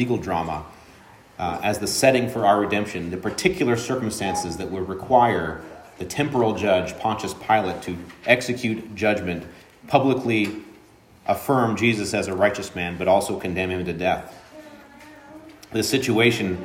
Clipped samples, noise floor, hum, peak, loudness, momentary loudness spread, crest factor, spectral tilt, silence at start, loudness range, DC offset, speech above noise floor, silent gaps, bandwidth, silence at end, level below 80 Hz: under 0.1%; -51 dBFS; none; -2 dBFS; -22 LUFS; 12 LU; 22 dB; -5 dB/octave; 0 s; 2 LU; under 0.1%; 29 dB; none; 16 kHz; 0 s; -52 dBFS